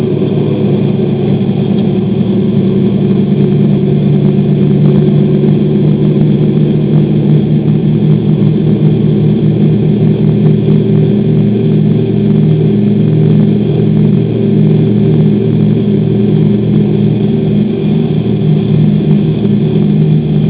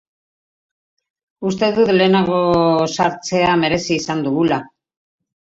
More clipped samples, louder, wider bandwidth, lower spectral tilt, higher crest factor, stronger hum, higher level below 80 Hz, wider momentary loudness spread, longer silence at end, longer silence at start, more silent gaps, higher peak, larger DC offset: first, 0.4% vs under 0.1%; first, -9 LUFS vs -16 LUFS; second, 4 kHz vs 8 kHz; first, -13 dB/octave vs -5.5 dB/octave; second, 8 dB vs 16 dB; neither; first, -36 dBFS vs -50 dBFS; second, 3 LU vs 6 LU; second, 0 s vs 0.85 s; second, 0 s vs 1.4 s; neither; about the same, 0 dBFS vs -2 dBFS; neither